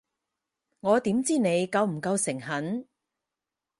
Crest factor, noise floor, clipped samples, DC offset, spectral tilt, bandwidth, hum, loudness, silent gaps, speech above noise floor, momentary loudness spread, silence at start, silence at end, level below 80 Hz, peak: 18 dB; -88 dBFS; under 0.1%; under 0.1%; -5 dB/octave; 11.5 kHz; none; -27 LUFS; none; 62 dB; 9 LU; 0.85 s; 0.95 s; -70 dBFS; -10 dBFS